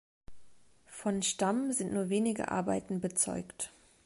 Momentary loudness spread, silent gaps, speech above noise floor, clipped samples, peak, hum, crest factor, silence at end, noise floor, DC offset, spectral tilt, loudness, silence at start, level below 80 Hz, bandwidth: 10 LU; none; 26 dB; under 0.1%; -16 dBFS; none; 18 dB; 0.35 s; -58 dBFS; under 0.1%; -4 dB/octave; -33 LUFS; 0.3 s; -64 dBFS; 11.5 kHz